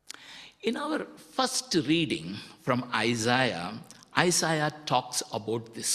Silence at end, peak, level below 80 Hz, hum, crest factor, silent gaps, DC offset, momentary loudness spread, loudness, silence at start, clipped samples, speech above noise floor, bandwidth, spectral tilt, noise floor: 0 s; -4 dBFS; -66 dBFS; none; 26 dB; none; under 0.1%; 13 LU; -28 LUFS; 0.15 s; under 0.1%; 20 dB; 15 kHz; -3.5 dB/octave; -49 dBFS